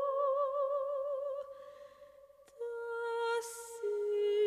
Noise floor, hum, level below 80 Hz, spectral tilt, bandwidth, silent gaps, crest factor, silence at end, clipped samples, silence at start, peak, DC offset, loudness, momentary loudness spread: -60 dBFS; 50 Hz at -80 dBFS; -82 dBFS; -1.5 dB/octave; 15 kHz; none; 12 dB; 0 s; under 0.1%; 0 s; -24 dBFS; under 0.1%; -36 LUFS; 17 LU